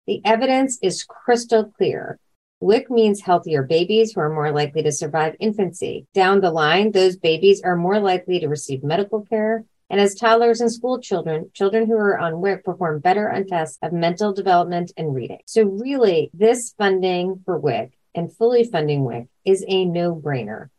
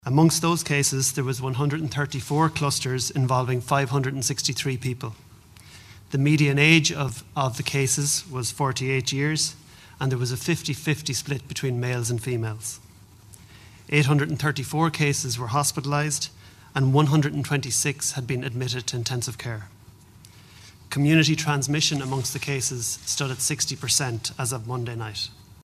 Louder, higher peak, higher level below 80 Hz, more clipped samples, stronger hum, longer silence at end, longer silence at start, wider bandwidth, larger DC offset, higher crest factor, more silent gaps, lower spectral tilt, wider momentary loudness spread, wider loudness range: first, -20 LUFS vs -24 LUFS; about the same, -2 dBFS vs -2 dBFS; second, -66 dBFS vs -56 dBFS; neither; neither; about the same, 0.1 s vs 0.1 s; about the same, 0.1 s vs 0.05 s; second, 12 kHz vs 15 kHz; neither; second, 16 dB vs 24 dB; first, 2.36-2.61 s, 15.43-15.47 s vs none; about the same, -5 dB/octave vs -4 dB/octave; about the same, 9 LU vs 11 LU; about the same, 3 LU vs 5 LU